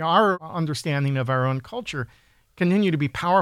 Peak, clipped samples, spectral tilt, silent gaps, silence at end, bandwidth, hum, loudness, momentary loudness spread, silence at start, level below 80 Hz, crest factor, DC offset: -6 dBFS; under 0.1%; -6.5 dB/octave; none; 0 s; 14 kHz; none; -24 LUFS; 11 LU; 0 s; -56 dBFS; 16 dB; under 0.1%